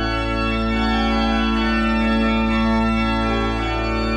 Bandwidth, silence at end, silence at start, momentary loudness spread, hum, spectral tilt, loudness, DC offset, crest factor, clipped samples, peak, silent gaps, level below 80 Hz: 9.4 kHz; 0 s; 0 s; 3 LU; none; -6.5 dB/octave; -19 LUFS; under 0.1%; 12 dB; under 0.1%; -8 dBFS; none; -26 dBFS